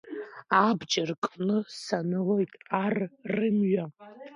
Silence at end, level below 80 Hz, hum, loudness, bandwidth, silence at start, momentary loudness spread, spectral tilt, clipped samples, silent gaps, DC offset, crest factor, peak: 0 s; -74 dBFS; none; -28 LUFS; 10.5 kHz; 0.05 s; 9 LU; -5.5 dB/octave; under 0.1%; 1.18-1.22 s; under 0.1%; 20 dB; -8 dBFS